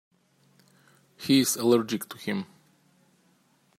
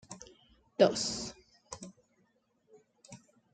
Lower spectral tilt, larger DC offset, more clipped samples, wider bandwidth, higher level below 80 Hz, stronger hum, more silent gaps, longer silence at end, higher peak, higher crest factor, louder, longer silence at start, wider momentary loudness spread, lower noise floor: about the same, -4 dB/octave vs -3.5 dB/octave; neither; neither; first, 16 kHz vs 9.4 kHz; second, -76 dBFS vs -68 dBFS; neither; neither; first, 1.35 s vs 0.35 s; about the same, -10 dBFS vs -10 dBFS; second, 20 dB vs 26 dB; first, -26 LUFS vs -30 LUFS; first, 1.2 s vs 0.1 s; second, 14 LU vs 27 LU; second, -66 dBFS vs -73 dBFS